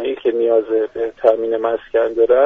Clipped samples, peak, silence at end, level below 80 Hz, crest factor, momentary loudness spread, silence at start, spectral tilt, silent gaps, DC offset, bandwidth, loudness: under 0.1%; 0 dBFS; 0 s; -54 dBFS; 16 dB; 4 LU; 0 s; -3 dB/octave; none; under 0.1%; 3.8 kHz; -17 LUFS